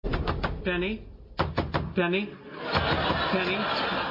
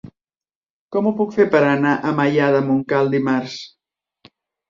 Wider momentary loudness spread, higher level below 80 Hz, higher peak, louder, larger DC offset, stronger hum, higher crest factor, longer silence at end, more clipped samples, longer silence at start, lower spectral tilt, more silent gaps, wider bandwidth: about the same, 8 LU vs 10 LU; first, -40 dBFS vs -62 dBFS; second, -12 dBFS vs -2 dBFS; second, -28 LUFS vs -18 LUFS; neither; neither; about the same, 16 dB vs 18 dB; second, 0 s vs 1 s; neither; about the same, 0 s vs 0.05 s; about the same, -7 dB/octave vs -7 dB/octave; second, none vs 0.56-0.62 s, 0.70-0.88 s; about the same, 7.4 kHz vs 7.4 kHz